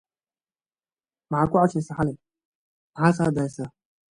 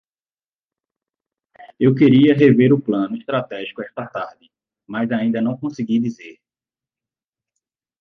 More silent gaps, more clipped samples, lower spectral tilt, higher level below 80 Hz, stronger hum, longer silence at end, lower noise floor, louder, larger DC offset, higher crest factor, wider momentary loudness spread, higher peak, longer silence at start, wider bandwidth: first, 2.45-2.93 s vs none; neither; about the same, -7.5 dB/octave vs -8.5 dB/octave; first, -56 dBFS vs -62 dBFS; neither; second, 0.5 s vs 1.7 s; about the same, under -90 dBFS vs under -90 dBFS; second, -24 LUFS vs -17 LUFS; neither; about the same, 22 dB vs 18 dB; about the same, 16 LU vs 17 LU; second, -6 dBFS vs -2 dBFS; second, 1.3 s vs 1.6 s; first, 10.5 kHz vs 6.4 kHz